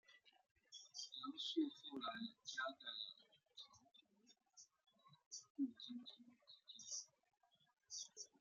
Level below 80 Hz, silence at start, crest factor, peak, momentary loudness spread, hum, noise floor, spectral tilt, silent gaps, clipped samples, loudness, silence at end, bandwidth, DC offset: under -90 dBFS; 0.1 s; 22 dB; -32 dBFS; 20 LU; none; -81 dBFS; -1.5 dB/octave; 0.51-0.55 s, 5.26-5.31 s, 5.50-5.55 s; under 0.1%; -50 LUFS; 0.15 s; 9.4 kHz; under 0.1%